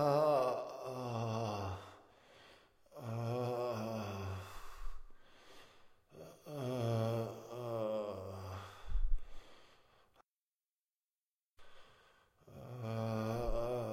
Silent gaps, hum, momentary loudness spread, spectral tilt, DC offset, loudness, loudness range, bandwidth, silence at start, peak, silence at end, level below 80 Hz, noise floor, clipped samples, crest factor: 10.28-11.18 s, 11.26-11.57 s; none; 23 LU; -7 dB/octave; under 0.1%; -40 LUFS; 10 LU; 15.5 kHz; 0 s; -22 dBFS; 0 s; -48 dBFS; under -90 dBFS; under 0.1%; 20 dB